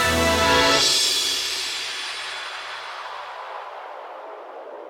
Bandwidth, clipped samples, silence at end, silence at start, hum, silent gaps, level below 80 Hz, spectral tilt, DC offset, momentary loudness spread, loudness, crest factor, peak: 18 kHz; under 0.1%; 0 s; 0 s; none; none; -48 dBFS; -1.5 dB/octave; under 0.1%; 21 LU; -20 LUFS; 20 dB; -4 dBFS